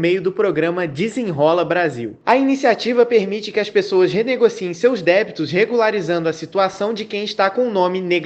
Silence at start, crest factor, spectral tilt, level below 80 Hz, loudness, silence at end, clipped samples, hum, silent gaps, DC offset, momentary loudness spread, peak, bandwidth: 0 s; 18 dB; -5.5 dB/octave; -62 dBFS; -18 LUFS; 0 s; under 0.1%; none; none; under 0.1%; 6 LU; 0 dBFS; 8.6 kHz